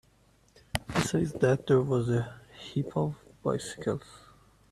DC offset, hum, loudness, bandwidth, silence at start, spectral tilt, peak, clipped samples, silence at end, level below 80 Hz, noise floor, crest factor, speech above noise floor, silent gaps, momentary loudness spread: under 0.1%; none; -30 LUFS; 13.5 kHz; 0.75 s; -6 dB/octave; -8 dBFS; under 0.1%; 0.55 s; -56 dBFS; -64 dBFS; 24 dB; 35 dB; none; 11 LU